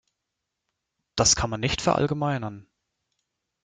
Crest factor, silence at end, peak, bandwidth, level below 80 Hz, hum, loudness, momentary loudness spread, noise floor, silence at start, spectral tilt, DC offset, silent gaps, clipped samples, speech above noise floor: 22 dB; 1 s; -6 dBFS; 11 kHz; -46 dBFS; none; -23 LUFS; 13 LU; -83 dBFS; 1.15 s; -3.5 dB/octave; under 0.1%; none; under 0.1%; 59 dB